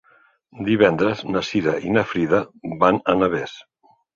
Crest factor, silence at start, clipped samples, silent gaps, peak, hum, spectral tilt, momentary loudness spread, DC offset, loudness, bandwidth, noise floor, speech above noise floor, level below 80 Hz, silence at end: 18 dB; 0.55 s; under 0.1%; none; -2 dBFS; none; -6.5 dB/octave; 10 LU; under 0.1%; -20 LUFS; 7.4 kHz; -57 dBFS; 37 dB; -52 dBFS; 0.55 s